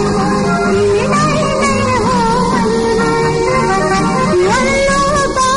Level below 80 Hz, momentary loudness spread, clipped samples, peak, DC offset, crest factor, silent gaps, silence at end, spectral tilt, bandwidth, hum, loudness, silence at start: -30 dBFS; 2 LU; under 0.1%; -2 dBFS; under 0.1%; 10 dB; none; 0 s; -5 dB/octave; 11 kHz; none; -12 LUFS; 0 s